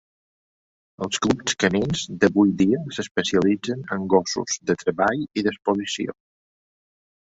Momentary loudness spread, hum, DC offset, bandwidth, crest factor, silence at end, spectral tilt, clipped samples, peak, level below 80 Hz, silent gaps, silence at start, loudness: 9 LU; none; under 0.1%; 8 kHz; 20 dB; 1.1 s; -4.5 dB/octave; under 0.1%; -4 dBFS; -54 dBFS; 3.11-3.15 s; 1 s; -22 LUFS